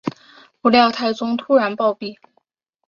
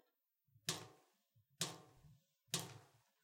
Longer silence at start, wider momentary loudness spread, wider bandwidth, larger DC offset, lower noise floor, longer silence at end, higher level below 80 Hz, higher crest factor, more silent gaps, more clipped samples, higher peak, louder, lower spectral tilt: second, 0.05 s vs 0.55 s; about the same, 16 LU vs 17 LU; second, 7.2 kHz vs 16.5 kHz; neither; second, -66 dBFS vs -85 dBFS; first, 0.75 s vs 0.35 s; first, -64 dBFS vs -84 dBFS; second, 18 dB vs 28 dB; neither; neither; first, -2 dBFS vs -24 dBFS; first, -18 LUFS vs -46 LUFS; first, -5.5 dB/octave vs -2 dB/octave